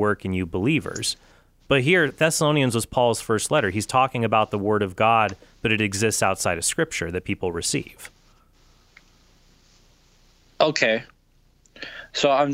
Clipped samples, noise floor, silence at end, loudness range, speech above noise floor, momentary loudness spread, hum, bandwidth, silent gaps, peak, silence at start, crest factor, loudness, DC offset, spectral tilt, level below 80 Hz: under 0.1%; -59 dBFS; 0 s; 9 LU; 37 dB; 9 LU; none; 16 kHz; none; -4 dBFS; 0 s; 20 dB; -22 LUFS; under 0.1%; -4 dB/octave; -52 dBFS